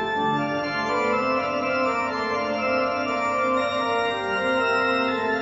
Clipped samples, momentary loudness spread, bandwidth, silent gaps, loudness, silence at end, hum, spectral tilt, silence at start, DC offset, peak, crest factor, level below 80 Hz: under 0.1%; 3 LU; 8 kHz; none; -23 LUFS; 0 s; none; -5 dB/octave; 0 s; under 0.1%; -10 dBFS; 12 dB; -58 dBFS